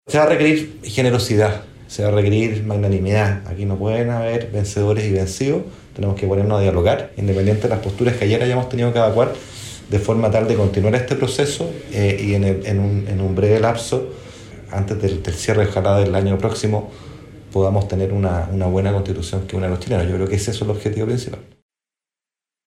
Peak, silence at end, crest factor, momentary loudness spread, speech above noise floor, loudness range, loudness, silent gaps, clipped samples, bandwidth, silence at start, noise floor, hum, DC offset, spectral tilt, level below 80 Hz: -4 dBFS; 1.25 s; 16 dB; 8 LU; over 72 dB; 3 LU; -19 LUFS; none; under 0.1%; 12.5 kHz; 0.05 s; under -90 dBFS; none; under 0.1%; -6.5 dB/octave; -40 dBFS